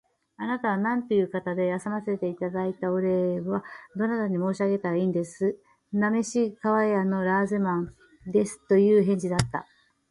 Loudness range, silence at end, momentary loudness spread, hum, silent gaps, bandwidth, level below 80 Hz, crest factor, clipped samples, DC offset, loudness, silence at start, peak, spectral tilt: 4 LU; 0.5 s; 9 LU; none; none; 11.5 kHz; -58 dBFS; 20 dB; under 0.1%; under 0.1%; -26 LUFS; 0.4 s; -6 dBFS; -7 dB/octave